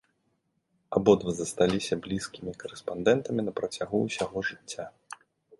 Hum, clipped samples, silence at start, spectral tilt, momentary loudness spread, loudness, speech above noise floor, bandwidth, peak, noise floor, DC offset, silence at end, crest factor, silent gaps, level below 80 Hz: none; under 0.1%; 0.9 s; -5 dB/octave; 16 LU; -29 LUFS; 47 dB; 11.5 kHz; -6 dBFS; -75 dBFS; under 0.1%; 0.45 s; 24 dB; none; -58 dBFS